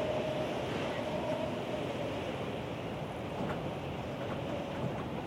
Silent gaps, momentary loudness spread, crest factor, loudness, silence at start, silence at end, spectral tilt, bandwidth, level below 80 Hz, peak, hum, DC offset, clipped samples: none; 4 LU; 14 dB; -37 LUFS; 0 s; 0 s; -6.5 dB/octave; 16 kHz; -58 dBFS; -22 dBFS; none; under 0.1%; under 0.1%